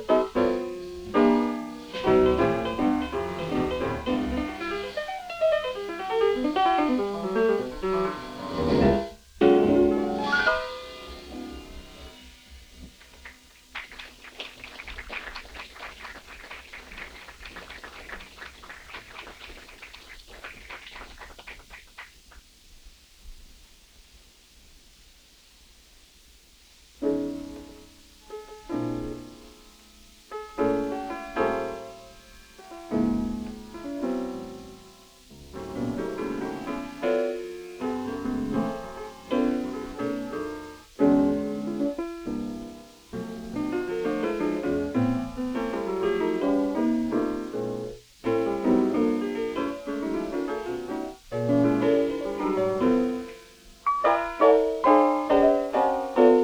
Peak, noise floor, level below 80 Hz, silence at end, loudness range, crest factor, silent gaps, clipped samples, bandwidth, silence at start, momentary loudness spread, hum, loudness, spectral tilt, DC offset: -6 dBFS; -55 dBFS; -48 dBFS; 0 s; 18 LU; 22 dB; none; under 0.1%; over 20 kHz; 0 s; 22 LU; none; -26 LUFS; -6.5 dB/octave; under 0.1%